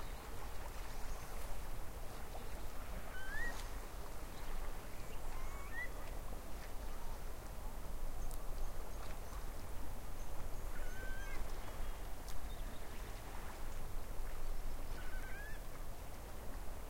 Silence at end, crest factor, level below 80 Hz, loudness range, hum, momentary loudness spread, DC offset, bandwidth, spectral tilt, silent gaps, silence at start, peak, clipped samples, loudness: 0 s; 12 dB; -44 dBFS; 2 LU; none; 4 LU; under 0.1%; 16 kHz; -4 dB/octave; none; 0 s; -28 dBFS; under 0.1%; -50 LUFS